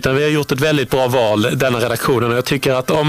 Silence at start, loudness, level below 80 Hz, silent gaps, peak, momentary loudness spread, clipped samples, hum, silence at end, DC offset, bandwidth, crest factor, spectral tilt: 0 s; -16 LUFS; -42 dBFS; none; -4 dBFS; 2 LU; under 0.1%; none; 0 s; under 0.1%; 16 kHz; 10 dB; -5 dB/octave